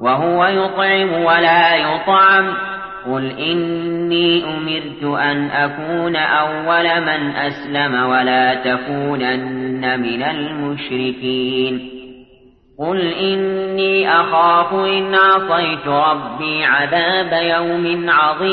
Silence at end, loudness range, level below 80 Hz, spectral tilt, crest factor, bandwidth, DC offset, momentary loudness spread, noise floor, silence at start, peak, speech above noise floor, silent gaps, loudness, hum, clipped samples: 0 s; 6 LU; -54 dBFS; -8.5 dB/octave; 14 dB; 5.4 kHz; under 0.1%; 10 LU; -48 dBFS; 0 s; -2 dBFS; 32 dB; none; -16 LUFS; none; under 0.1%